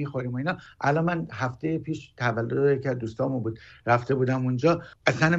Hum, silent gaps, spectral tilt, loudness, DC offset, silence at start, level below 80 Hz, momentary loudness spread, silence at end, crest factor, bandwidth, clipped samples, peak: none; none; -7 dB/octave; -27 LUFS; under 0.1%; 0 s; -58 dBFS; 8 LU; 0 s; 22 dB; 7.8 kHz; under 0.1%; -4 dBFS